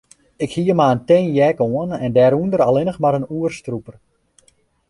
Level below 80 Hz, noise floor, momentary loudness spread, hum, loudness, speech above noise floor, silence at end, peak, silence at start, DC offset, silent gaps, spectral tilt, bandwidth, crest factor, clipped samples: -52 dBFS; -58 dBFS; 12 LU; none; -17 LUFS; 42 dB; 1 s; -2 dBFS; 0.4 s; under 0.1%; none; -7.5 dB/octave; 11.5 kHz; 16 dB; under 0.1%